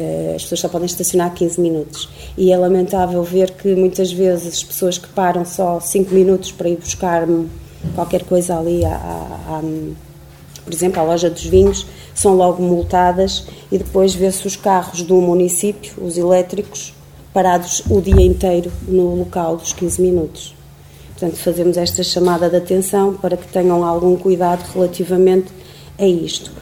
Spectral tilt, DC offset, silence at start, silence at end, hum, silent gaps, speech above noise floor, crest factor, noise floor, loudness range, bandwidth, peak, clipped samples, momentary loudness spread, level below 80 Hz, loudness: -5 dB/octave; 0.2%; 0 s; 0 s; none; none; 24 dB; 16 dB; -39 dBFS; 4 LU; 17 kHz; 0 dBFS; under 0.1%; 11 LU; -32 dBFS; -16 LUFS